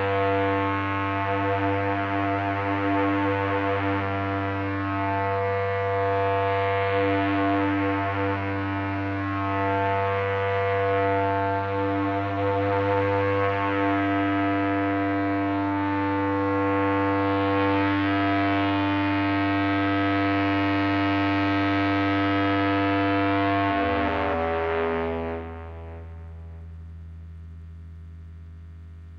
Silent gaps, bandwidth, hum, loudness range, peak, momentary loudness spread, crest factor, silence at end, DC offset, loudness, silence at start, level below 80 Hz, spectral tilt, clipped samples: none; 6.2 kHz; none; 4 LU; -8 dBFS; 17 LU; 16 dB; 0 s; under 0.1%; -24 LUFS; 0 s; -50 dBFS; -8.5 dB/octave; under 0.1%